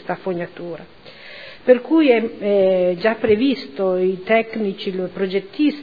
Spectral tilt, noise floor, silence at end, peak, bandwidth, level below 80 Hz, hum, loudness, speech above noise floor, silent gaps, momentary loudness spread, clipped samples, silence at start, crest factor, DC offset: -8.5 dB/octave; -39 dBFS; 0 s; -2 dBFS; 5 kHz; -56 dBFS; none; -19 LUFS; 20 dB; none; 17 LU; under 0.1%; 0.05 s; 18 dB; 0.4%